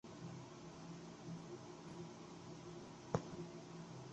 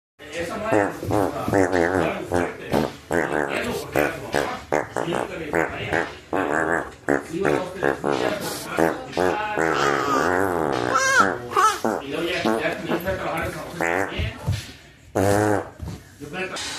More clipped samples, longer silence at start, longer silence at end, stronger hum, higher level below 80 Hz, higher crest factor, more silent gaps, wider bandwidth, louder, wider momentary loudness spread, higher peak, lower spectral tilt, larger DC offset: neither; second, 0.05 s vs 0.2 s; about the same, 0 s vs 0 s; neither; second, -74 dBFS vs -46 dBFS; first, 32 dB vs 20 dB; neither; second, 8.8 kHz vs 15 kHz; second, -52 LUFS vs -23 LUFS; about the same, 9 LU vs 8 LU; second, -20 dBFS vs -4 dBFS; first, -6 dB/octave vs -4.5 dB/octave; neither